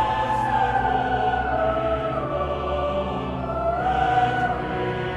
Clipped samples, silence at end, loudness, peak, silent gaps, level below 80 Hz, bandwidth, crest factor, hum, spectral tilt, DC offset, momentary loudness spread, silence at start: under 0.1%; 0 s; -23 LUFS; -10 dBFS; none; -38 dBFS; 11 kHz; 12 dB; none; -7 dB/octave; under 0.1%; 5 LU; 0 s